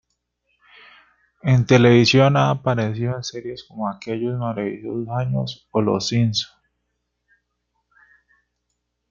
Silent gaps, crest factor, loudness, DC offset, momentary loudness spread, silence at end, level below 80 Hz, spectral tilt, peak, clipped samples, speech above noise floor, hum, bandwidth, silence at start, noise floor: none; 20 dB; -20 LUFS; under 0.1%; 15 LU; 2.65 s; -56 dBFS; -6 dB/octave; -2 dBFS; under 0.1%; 56 dB; 60 Hz at -40 dBFS; 7.4 kHz; 1.45 s; -75 dBFS